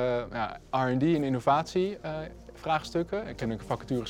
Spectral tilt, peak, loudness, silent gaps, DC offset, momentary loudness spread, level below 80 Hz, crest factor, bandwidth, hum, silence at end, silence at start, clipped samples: -6.5 dB/octave; -10 dBFS; -30 LUFS; none; under 0.1%; 11 LU; -52 dBFS; 18 dB; 16 kHz; none; 0 s; 0 s; under 0.1%